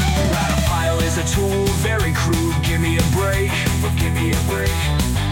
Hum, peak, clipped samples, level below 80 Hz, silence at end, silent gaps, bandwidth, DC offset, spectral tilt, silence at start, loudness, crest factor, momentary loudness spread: none; -6 dBFS; under 0.1%; -26 dBFS; 0 s; none; 17 kHz; under 0.1%; -5 dB/octave; 0 s; -19 LUFS; 12 dB; 1 LU